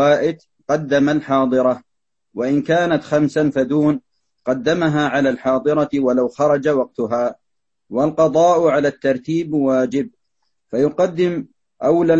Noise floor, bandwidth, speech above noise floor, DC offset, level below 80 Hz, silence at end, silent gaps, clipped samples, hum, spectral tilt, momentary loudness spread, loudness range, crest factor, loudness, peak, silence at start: -80 dBFS; 8.2 kHz; 63 dB; under 0.1%; -54 dBFS; 0 s; none; under 0.1%; none; -6.5 dB/octave; 9 LU; 1 LU; 16 dB; -18 LUFS; -2 dBFS; 0 s